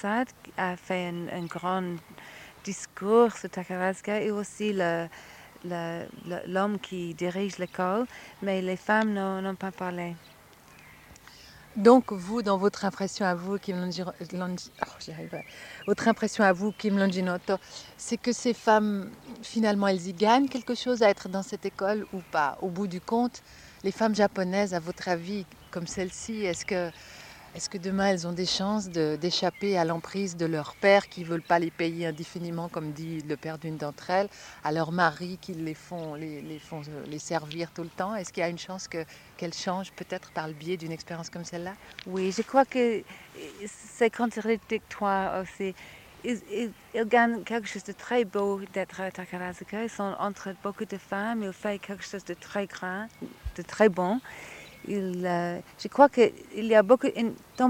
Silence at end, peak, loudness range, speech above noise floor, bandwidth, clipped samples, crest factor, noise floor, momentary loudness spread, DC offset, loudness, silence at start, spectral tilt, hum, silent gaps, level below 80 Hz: 0 s; -4 dBFS; 7 LU; 25 dB; 17 kHz; under 0.1%; 26 dB; -54 dBFS; 15 LU; under 0.1%; -29 LUFS; 0 s; -5 dB/octave; none; none; -60 dBFS